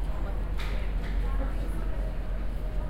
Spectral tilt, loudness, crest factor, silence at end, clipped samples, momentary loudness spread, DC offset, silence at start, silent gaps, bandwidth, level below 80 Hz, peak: -7 dB/octave; -34 LUFS; 10 dB; 0 s; under 0.1%; 3 LU; under 0.1%; 0 s; none; 5.4 kHz; -30 dBFS; -18 dBFS